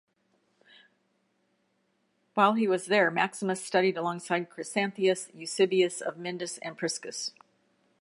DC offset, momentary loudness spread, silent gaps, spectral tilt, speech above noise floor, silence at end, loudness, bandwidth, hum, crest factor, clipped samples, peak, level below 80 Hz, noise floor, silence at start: under 0.1%; 11 LU; none; -4 dB/octave; 45 dB; 0.7 s; -28 LUFS; 11.5 kHz; none; 22 dB; under 0.1%; -8 dBFS; -84 dBFS; -74 dBFS; 2.35 s